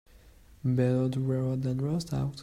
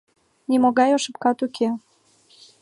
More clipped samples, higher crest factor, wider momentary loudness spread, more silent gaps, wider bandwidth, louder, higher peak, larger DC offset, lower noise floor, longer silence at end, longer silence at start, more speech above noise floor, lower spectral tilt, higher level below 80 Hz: neither; about the same, 16 dB vs 18 dB; second, 5 LU vs 11 LU; neither; about the same, 10.5 kHz vs 11.5 kHz; second, -29 LUFS vs -21 LUFS; second, -14 dBFS vs -6 dBFS; neither; about the same, -55 dBFS vs -57 dBFS; second, 0 s vs 0.85 s; second, 0.25 s vs 0.5 s; second, 27 dB vs 37 dB; first, -8 dB/octave vs -4 dB/octave; first, -54 dBFS vs -76 dBFS